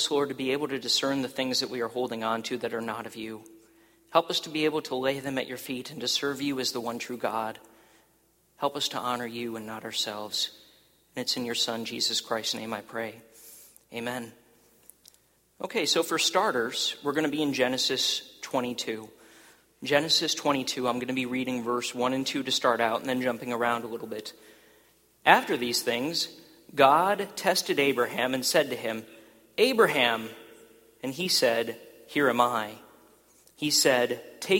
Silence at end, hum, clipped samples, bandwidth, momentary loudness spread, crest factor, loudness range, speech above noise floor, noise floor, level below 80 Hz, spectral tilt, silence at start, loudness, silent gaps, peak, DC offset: 0 s; none; under 0.1%; 16.5 kHz; 14 LU; 26 dB; 7 LU; 38 dB; -66 dBFS; -72 dBFS; -2.5 dB/octave; 0 s; -27 LUFS; none; -2 dBFS; under 0.1%